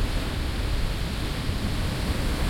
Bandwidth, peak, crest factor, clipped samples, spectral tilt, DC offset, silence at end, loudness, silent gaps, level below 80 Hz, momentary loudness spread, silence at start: 16.5 kHz; -12 dBFS; 12 dB; under 0.1%; -5 dB/octave; under 0.1%; 0 s; -29 LUFS; none; -28 dBFS; 2 LU; 0 s